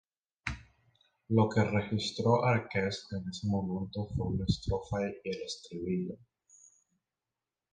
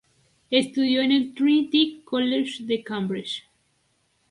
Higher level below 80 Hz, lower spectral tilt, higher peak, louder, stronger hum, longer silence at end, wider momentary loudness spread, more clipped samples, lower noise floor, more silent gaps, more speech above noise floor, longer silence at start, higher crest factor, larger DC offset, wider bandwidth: first, -50 dBFS vs -70 dBFS; first, -6.5 dB/octave vs -5 dB/octave; second, -12 dBFS vs -6 dBFS; second, -33 LUFS vs -23 LUFS; neither; first, 1.55 s vs 0.9 s; first, 13 LU vs 9 LU; neither; first, under -90 dBFS vs -68 dBFS; neither; first, over 58 dB vs 46 dB; about the same, 0.45 s vs 0.5 s; about the same, 22 dB vs 18 dB; neither; second, 9.6 kHz vs 11.5 kHz